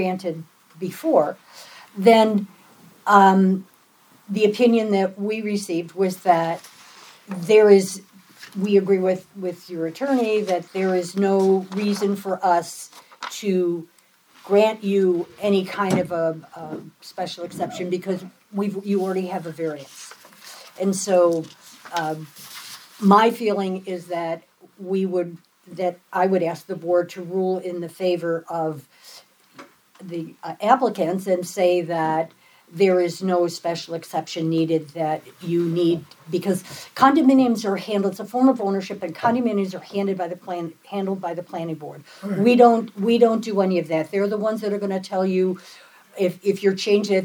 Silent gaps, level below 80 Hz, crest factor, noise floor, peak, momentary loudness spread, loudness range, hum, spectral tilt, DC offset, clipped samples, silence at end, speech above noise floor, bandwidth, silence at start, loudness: none; -76 dBFS; 22 dB; -55 dBFS; 0 dBFS; 17 LU; 6 LU; none; -6 dB/octave; under 0.1%; under 0.1%; 0 s; 34 dB; over 20 kHz; 0 s; -21 LUFS